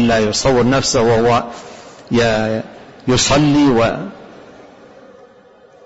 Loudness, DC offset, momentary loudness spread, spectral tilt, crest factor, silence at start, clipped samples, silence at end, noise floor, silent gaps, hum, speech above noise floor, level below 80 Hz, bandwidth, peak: -14 LUFS; under 0.1%; 18 LU; -4.5 dB/octave; 14 dB; 0 s; under 0.1%; 1.6 s; -45 dBFS; none; none; 32 dB; -38 dBFS; 8 kHz; -2 dBFS